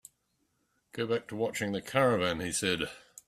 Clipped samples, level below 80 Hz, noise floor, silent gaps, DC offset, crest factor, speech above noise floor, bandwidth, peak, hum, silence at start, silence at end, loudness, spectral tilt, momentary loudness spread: under 0.1%; -64 dBFS; -77 dBFS; none; under 0.1%; 22 dB; 46 dB; 14.5 kHz; -12 dBFS; none; 0.95 s; 0.3 s; -31 LUFS; -4 dB/octave; 10 LU